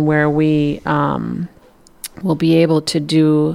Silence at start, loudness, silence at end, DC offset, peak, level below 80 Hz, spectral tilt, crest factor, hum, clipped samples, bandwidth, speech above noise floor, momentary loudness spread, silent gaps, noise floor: 0 s; -16 LUFS; 0 s; under 0.1%; -2 dBFS; -46 dBFS; -6.5 dB/octave; 14 dB; none; under 0.1%; 15.5 kHz; 32 dB; 14 LU; none; -47 dBFS